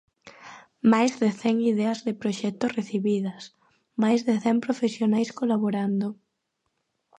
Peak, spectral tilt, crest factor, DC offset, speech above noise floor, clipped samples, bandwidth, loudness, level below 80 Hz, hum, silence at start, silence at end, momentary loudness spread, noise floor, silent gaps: -8 dBFS; -6 dB/octave; 18 dB; under 0.1%; 54 dB; under 0.1%; 9 kHz; -25 LUFS; -74 dBFS; none; 0.25 s; 1.05 s; 12 LU; -78 dBFS; none